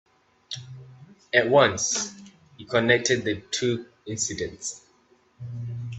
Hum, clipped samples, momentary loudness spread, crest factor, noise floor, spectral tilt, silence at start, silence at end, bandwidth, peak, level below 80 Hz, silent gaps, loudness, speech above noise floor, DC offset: none; under 0.1%; 19 LU; 22 dB; -62 dBFS; -3 dB/octave; 0.5 s; 0 s; 8.6 kHz; -4 dBFS; -62 dBFS; none; -24 LUFS; 38 dB; under 0.1%